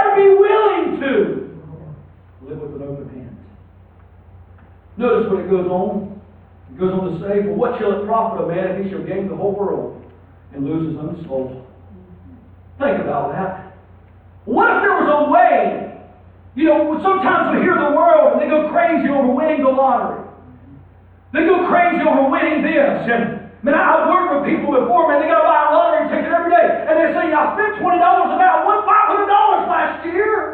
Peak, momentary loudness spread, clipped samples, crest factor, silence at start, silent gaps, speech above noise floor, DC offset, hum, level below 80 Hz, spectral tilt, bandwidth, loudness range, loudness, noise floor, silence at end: -2 dBFS; 15 LU; under 0.1%; 14 dB; 0 s; none; 29 dB; under 0.1%; none; -52 dBFS; -9.5 dB/octave; 4.3 kHz; 11 LU; -16 LUFS; -45 dBFS; 0 s